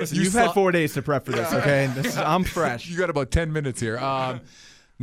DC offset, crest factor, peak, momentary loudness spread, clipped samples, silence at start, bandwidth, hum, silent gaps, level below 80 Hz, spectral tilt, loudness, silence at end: under 0.1%; 18 dB; -6 dBFS; 7 LU; under 0.1%; 0 s; 16 kHz; none; none; -42 dBFS; -5 dB/octave; -23 LUFS; 0 s